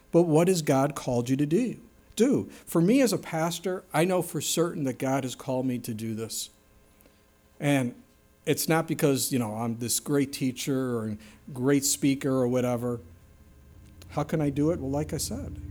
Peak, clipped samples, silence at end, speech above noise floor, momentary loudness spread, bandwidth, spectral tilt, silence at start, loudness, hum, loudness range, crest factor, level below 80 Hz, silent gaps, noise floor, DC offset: -10 dBFS; under 0.1%; 0 s; 34 dB; 10 LU; over 20 kHz; -5 dB/octave; 0.15 s; -27 LUFS; none; 5 LU; 18 dB; -56 dBFS; none; -60 dBFS; under 0.1%